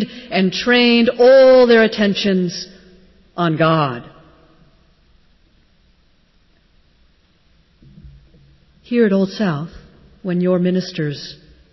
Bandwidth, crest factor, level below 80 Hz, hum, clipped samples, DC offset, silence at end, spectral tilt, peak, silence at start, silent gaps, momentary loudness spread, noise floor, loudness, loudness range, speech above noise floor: 6 kHz; 14 dB; -52 dBFS; none; under 0.1%; under 0.1%; 0.4 s; -6.5 dB/octave; -4 dBFS; 0 s; none; 21 LU; -56 dBFS; -15 LUFS; 10 LU; 41 dB